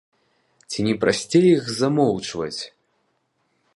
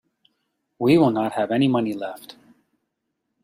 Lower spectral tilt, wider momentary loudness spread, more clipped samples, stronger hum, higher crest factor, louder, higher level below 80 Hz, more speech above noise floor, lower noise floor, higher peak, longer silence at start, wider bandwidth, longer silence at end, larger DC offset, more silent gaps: second, -5.5 dB/octave vs -7.5 dB/octave; about the same, 15 LU vs 15 LU; neither; neither; about the same, 18 dB vs 18 dB; about the same, -21 LUFS vs -21 LUFS; about the same, -58 dBFS vs -62 dBFS; second, 50 dB vs 58 dB; second, -70 dBFS vs -78 dBFS; about the same, -4 dBFS vs -6 dBFS; about the same, 0.7 s vs 0.8 s; second, 11.5 kHz vs 15.5 kHz; about the same, 1.1 s vs 1.1 s; neither; neither